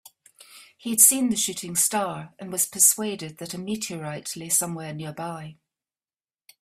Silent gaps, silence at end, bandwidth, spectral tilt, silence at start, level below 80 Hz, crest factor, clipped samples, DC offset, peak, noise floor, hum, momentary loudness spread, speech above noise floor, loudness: none; 1.1 s; 16 kHz; -2.5 dB/octave; 0.5 s; -68 dBFS; 26 dB; under 0.1%; under 0.1%; 0 dBFS; under -90 dBFS; none; 19 LU; over 65 dB; -22 LUFS